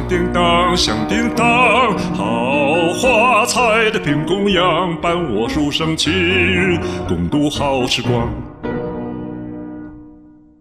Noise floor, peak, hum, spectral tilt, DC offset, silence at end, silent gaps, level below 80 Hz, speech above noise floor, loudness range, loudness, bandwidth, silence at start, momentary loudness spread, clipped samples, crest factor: -43 dBFS; -2 dBFS; none; -4.5 dB/octave; under 0.1%; 0.45 s; none; -36 dBFS; 28 dB; 6 LU; -15 LUFS; 14.5 kHz; 0 s; 14 LU; under 0.1%; 14 dB